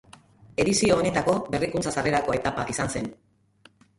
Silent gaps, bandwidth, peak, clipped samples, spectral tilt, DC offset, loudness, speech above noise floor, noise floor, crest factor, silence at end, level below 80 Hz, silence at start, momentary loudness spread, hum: none; 11.5 kHz; -8 dBFS; under 0.1%; -4.5 dB/octave; under 0.1%; -25 LUFS; 34 dB; -58 dBFS; 18 dB; 0.85 s; -50 dBFS; 0.45 s; 9 LU; none